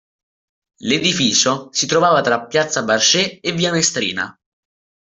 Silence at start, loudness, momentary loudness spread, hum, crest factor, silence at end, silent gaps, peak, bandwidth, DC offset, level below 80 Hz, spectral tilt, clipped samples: 0.8 s; -16 LUFS; 7 LU; none; 16 dB; 0.8 s; none; -2 dBFS; 8.2 kHz; under 0.1%; -58 dBFS; -2.5 dB/octave; under 0.1%